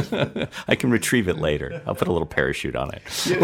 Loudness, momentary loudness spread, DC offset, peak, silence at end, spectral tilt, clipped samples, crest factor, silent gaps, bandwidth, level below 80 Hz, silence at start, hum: -23 LUFS; 8 LU; under 0.1%; -4 dBFS; 0 s; -4.5 dB/octave; under 0.1%; 20 dB; none; 16.5 kHz; -44 dBFS; 0 s; none